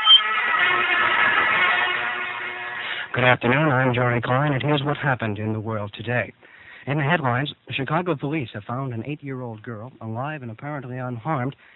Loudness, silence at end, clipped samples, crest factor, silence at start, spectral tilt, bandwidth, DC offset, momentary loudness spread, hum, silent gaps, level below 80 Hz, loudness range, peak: -21 LUFS; 0.2 s; under 0.1%; 22 dB; 0 s; -7.5 dB/octave; 4.2 kHz; under 0.1%; 15 LU; none; none; -58 dBFS; 9 LU; 0 dBFS